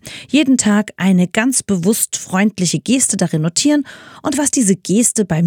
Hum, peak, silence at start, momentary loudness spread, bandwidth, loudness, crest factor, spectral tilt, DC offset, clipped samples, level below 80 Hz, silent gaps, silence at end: none; 0 dBFS; 0.05 s; 4 LU; 18.5 kHz; -15 LUFS; 16 dB; -4 dB/octave; under 0.1%; under 0.1%; -54 dBFS; none; 0 s